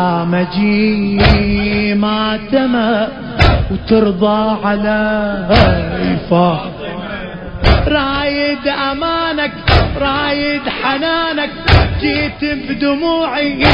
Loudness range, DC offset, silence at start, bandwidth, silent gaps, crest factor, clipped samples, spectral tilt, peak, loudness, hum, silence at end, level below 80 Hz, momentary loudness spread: 2 LU; under 0.1%; 0 s; 8 kHz; none; 14 dB; 0.1%; -8 dB/octave; 0 dBFS; -14 LUFS; none; 0 s; -22 dBFS; 6 LU